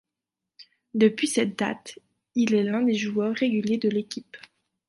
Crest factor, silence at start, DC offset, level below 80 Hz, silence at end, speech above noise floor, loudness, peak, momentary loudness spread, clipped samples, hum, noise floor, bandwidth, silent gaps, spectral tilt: 18 dB; 0.6 s; under 0.1%; -72 dBFS; 0.5 s; 63 dB; -25 LUFS; -8 dBFS; 13 LU; under 0.1%; none; -87 dBFS; 11.5 kHz; none; -5 dB/octave